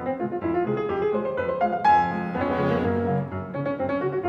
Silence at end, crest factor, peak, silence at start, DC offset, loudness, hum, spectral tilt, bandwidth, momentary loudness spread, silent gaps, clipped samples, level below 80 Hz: 0 s; 14 dB; -10 dBFS; 0 s; under 0.1%; -25 LUFS; none; -8.5 dB/octave; 7.4 kHz; 8 LU; none; under 0.1%; -54 dBFS